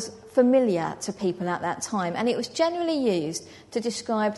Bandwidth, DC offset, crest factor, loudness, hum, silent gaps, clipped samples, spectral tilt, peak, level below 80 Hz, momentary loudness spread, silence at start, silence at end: 11.5 kHz; under 0.1%; 18 dB; -26 LUFS; none; none; under 0.1%; -4.5 dB/octave; -8 dBFS; -66 dBFS; 10 LU; 0 s; 0 s